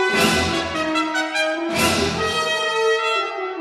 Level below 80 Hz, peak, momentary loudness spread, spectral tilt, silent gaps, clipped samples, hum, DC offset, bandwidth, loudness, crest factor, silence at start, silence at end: -44 dBFS; -4 dBFS; 4 LU; -3 dB/octave; none; under 0.1%; none; under 0.1%; 16 kHz; -19 LUFS; 16 dB; 0 s; 0 s